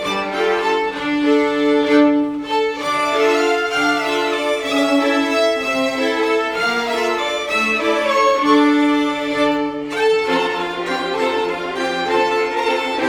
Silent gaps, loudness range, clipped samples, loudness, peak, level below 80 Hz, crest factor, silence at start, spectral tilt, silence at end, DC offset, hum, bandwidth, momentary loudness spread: none; 2 LU; under 0.1%; -17 LUFS; 0 dBFS; -54 dBFS; 16 dB; 0 s; -3.5 dB/octave; 0 s; under 0.1%; none; 16 kHz; 6 LU